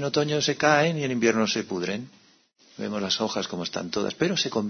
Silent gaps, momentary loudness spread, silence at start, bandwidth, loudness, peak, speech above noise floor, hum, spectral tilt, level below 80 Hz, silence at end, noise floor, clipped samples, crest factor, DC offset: none; 11 LU; 0 s; 6.6 kHz; -25 LUFS; -6 dBFS; 34 dB; none; -4 dB/octave; -66 dBFS; 0 s; -59 dBFS; under 0.1%; 20 dB; under 0.1%